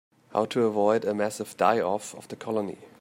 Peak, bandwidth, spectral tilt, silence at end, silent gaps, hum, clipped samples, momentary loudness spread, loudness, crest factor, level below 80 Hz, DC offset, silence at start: -8 dBFS; 16 kHz; -5 dB/octave; 0.1 s; none; none; under 0.1%; 11 LU; -27 LUFS; 18 dB; -74 dBFS; under 0.1%; 0.3 s